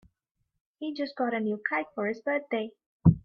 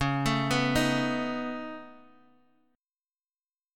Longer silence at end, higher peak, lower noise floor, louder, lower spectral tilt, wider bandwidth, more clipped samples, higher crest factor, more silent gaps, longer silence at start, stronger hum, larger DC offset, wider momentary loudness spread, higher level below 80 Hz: second, 0.05 s vs 1.75 s; first, -6 dBFS vs -12 dBFS; second, -80 dBFS vs under -90 dBFS; about the same, -30 LUFS vs -28 LUFS; first, -9.5 dB/octave vs -5 dB/octave; second, 5.8 kHz vs 17.5 kHz; neither; first, 24 dB vs 18 dB; first, 2.86-3.00 s vs none; first, 0.8 s vs 0 s; neither; neither; second, 11 LU vs 14 LU; about the same, -50 dBFS vs -50 dBFS